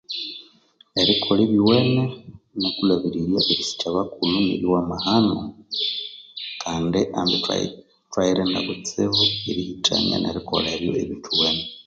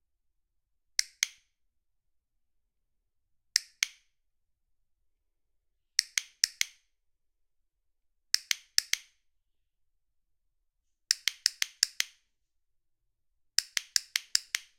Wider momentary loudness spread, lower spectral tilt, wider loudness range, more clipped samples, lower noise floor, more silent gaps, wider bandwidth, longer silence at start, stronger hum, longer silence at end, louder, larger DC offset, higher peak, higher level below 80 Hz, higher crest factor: first, 11 LU vs 5 LU; first, -5 dB/octave vs 5 dB/octave; about the same, 3 LU vs 5 LU; neither; second, -56 dBFS vs -78 dBFS; neither; second, 7.8 kHz vs 16.5 kHz; second, 0.1 s vs 1 s; neither; second, 0.05 s vs 0.2 s; first, -21 LUFS vs -30 LUFS; neither; about the same, -4 dBFS vs -2 dBFS; first, -50 dBFS vs -76 dBFS; second, 18 dB vs 36 dB